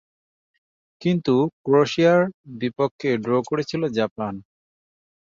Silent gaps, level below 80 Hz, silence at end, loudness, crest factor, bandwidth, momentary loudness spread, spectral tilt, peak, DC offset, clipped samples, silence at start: 1.53-1.64 s, 2.34-2.44 s, 2.91-2.99 s, 4.11-4.16 s; -62 dBFS; 0.9 s; -22 LUFS; 16 dB; 7.6 kHz; 12 LU; -7 dB/octave; -6 dBFS; under 0.1%; under 0.1%; 1 s